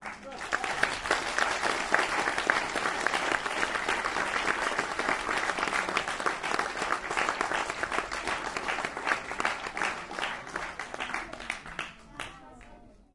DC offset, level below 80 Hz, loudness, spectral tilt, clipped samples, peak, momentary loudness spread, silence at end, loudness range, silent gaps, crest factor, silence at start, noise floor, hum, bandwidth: under 0.1%; -56 dBFS; -30 LUFS; -2 dB/octave; under 0.1%; -6 dBFS; 9 LU; 0.15 s; 6 LU; none; 26 dB; 0 s; -53 dBFS; none; 11.5 kHz